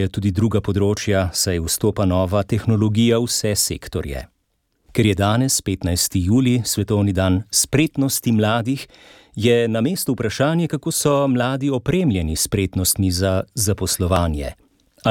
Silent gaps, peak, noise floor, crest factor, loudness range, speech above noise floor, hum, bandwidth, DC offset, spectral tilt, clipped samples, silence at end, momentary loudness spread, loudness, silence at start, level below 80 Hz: none; -4 dBFS; -69 dBFS; 14 dB; 2 LU; 50 dB; none; 17.5 kHz; under 0.1%; -5 dB/octave; under 0.1%; 0 s; 5 LU; -19 LUFS; 0 s; -38 dBFS